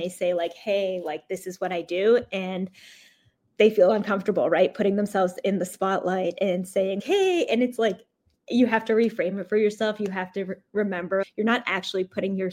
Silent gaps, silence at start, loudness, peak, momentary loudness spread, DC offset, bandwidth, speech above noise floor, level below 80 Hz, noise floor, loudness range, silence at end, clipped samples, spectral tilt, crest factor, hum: none; 0 s; -25 LUFS; -6 dBFS; 9 LU; under 0.1%; 16 kHz; 40 dB; -72 dBFS; -64 dBFS; 3 LU; 0 s; under 0.1%; -5.5 dB/octave; 18 dB; none